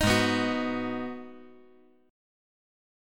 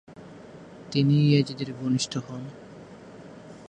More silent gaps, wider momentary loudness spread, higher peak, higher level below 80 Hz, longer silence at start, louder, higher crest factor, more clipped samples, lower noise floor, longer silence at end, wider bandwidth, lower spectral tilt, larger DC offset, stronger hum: neither; second, 19 LU vs 25 LU; about the same, -10 dBFS vs -8 dBFS; first, -50 dBFS vs -64 dBFS; about the same, 0 s vs 0.1 s; second, -28 LUFS vs -25 LUFS; about the same, 20 dB vs 18 dB; neither; first, -59 dBFS vs -45 dBFS; first, 1.65 s vs 0.05 s; first, 17.5 kHz vs 9.6 kHz; second, -4.5 dB/octave vs -6 dB/octave; neither; neither